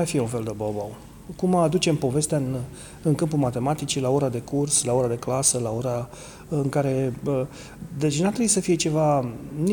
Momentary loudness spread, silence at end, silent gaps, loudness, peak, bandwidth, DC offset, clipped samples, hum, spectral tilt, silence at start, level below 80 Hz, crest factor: 12 LU; 0 s; none; -24 LUFS; -8 dBFS; 19 kHz; under 0.1%; under 0.1%; none; -5 dB/octave; 0 s; -50 dBFS; 16 dB